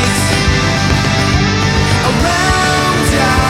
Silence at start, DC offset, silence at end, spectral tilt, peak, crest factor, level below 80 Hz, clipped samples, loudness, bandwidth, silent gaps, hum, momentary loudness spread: 0 s; under 0.1%; 0 s; -4.5 dB/octave; 0 dBFS; 12 dB; -22 dBFS; under 0.1%; -12 LUFS; 16 kHz; none; none; 1 LU